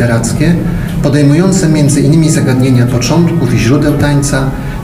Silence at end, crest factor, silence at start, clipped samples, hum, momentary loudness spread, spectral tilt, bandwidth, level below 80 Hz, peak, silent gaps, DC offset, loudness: 0 s; 8 dB; 0 s; 0.7%; none; 5 LU; -6 dB/octave; 15.5 kHz; -26 dBFS; 0 dBFS; none; under 0.1%; -10 LUFS